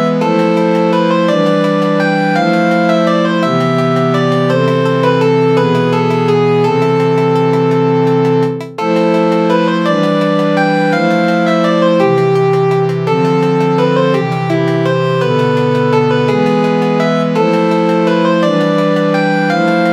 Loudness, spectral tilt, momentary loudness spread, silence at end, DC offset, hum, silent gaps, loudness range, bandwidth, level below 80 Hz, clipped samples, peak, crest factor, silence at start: -12 LUFS; -7 dB/octave; 2 LU; 0 s; under 0.1%; none; none; 1 LU; 11 kHz; -66 dBFS; under 0.1%; 0 dBFS; 12 dB; 0 s